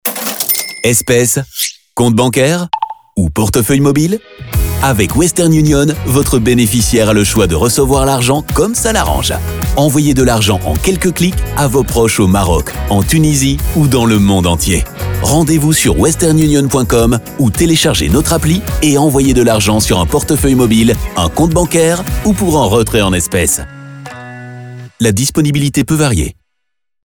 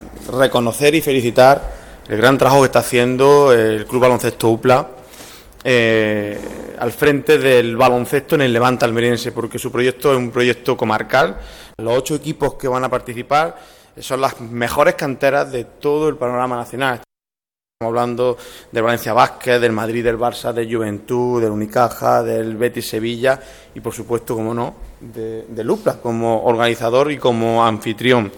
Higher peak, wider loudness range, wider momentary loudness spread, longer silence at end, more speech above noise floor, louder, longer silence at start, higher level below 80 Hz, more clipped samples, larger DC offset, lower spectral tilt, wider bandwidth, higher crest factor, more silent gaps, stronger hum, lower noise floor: about the same, -2 dBFS vs 0 dBFS; second, 3 LU vs 7 LU; second, 7 LU vs 13 LU; first, 0.75 s vs 0 s; second, 66 dB vs over 74 dB; first, -11 LUFS vs -16 LUFS; about the same, 0.05 s vs 0 s; first, -24 dBFS vs -44 dBFS; neither; neither; about the same, -5 dB/octave vs -5 dB/octave; about the same, over 20 kHz vs 19.5 kHz; second, 10 dB vs 16 dB; neither; neither; second, -76 dBFS vs under -90 dBFS